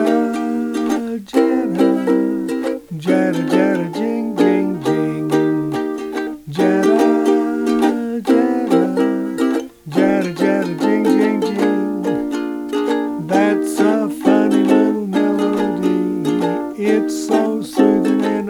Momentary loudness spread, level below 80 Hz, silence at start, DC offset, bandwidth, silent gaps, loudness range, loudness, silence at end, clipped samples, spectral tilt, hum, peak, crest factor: 7 LU; -56 dBFS; 0 s; under 0.1%; 17 kHz; none; 2 LU; -17 LUFS; 0 s; under 0.1%; -6.5 dB/octave; none; -2 dBFS; 14 dB